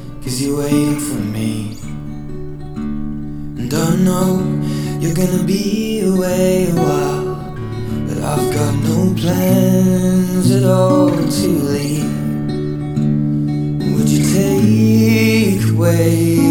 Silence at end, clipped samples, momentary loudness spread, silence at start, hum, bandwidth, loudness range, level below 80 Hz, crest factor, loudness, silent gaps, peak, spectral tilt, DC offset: 0 s; under 0.1%; 13 LU; 0 s; none; 18.5 kHz; 6 LU; -36 dBFS; 14 dB; -15 LUFS; none; 0 dBFS; -6.5 dB/octave; under 0.1%